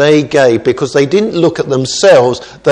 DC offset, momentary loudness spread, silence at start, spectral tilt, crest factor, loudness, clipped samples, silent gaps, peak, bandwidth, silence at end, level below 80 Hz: under 0.1%; 7 LU; 0 s; -5 dB/octave; 10 dB; -10 LUFS; 0.6%; none; 0 dBFS; 10.5 kHz; 0 s; -48 dBFS